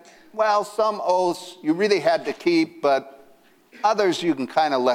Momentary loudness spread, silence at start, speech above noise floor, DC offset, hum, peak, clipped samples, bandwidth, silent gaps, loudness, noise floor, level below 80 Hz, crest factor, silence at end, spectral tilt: 5 LU; 0.35 s; 33 dB; under 0.1%; none; -6 dBFS; under 0.1%; 15 kHz; none; -22 LUFS; -54 dBFS; -72 dBFS; 16 dB; 0 s; -4.5 dB/octave